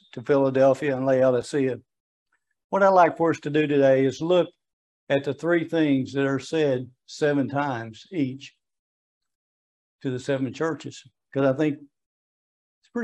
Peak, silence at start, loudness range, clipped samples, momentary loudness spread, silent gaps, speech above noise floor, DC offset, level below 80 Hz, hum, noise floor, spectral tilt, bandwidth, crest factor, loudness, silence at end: -6 dBFS; 0.15 s; 9 LU; under 0.1%; 14 LU; 2.00-2.26 s, 2.64-2.70 s, 4.73-5.07 s, 8.79-9.21 s, 9.35-9.99 s, 12.06-12.82 s; over 67 dB; under 0.1%; -72 dBFS; none; under -90 dBFS; -6.5 dB/octave; 10 kHz; 18 dB; -23 LUFS; 0 s